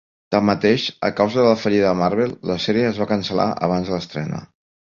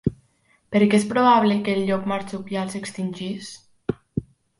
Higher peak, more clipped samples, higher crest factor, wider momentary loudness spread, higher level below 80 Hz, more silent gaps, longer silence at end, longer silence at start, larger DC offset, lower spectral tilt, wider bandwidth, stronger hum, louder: about the same, -2 dBFS vs -4 dBFS; neither; about the same, 18 dB vs 18 dB; second, 8 LU vs 16 LU; about the same, -50 dBFS vs -52 dBFS; neither; about the same, 0.4 s vs 0.35 s; first, 0.3 s vs 0.05 s; neither; about the same, -6.5 dB/octave vs -6 dB/octave; second, 7.4 kHz vs 11.5 kHz; neither; first, -19 LUFS vs -22 LUFS